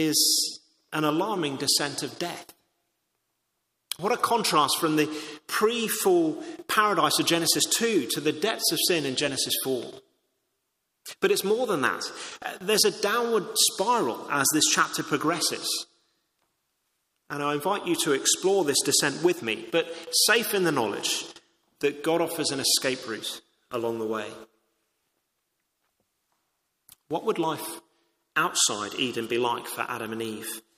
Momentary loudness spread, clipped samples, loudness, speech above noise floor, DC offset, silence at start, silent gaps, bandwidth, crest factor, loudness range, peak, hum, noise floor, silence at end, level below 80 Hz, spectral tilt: 13 LU; under 0.1%; -25 LUFS; 53 dB; under 0.1%; 0 s; none; 15.5 kHz; 20 dB; 8 LU; -6 dBFS; none; -78 dBFS; 0.2 s; -72 dBFS; -2 dB/octave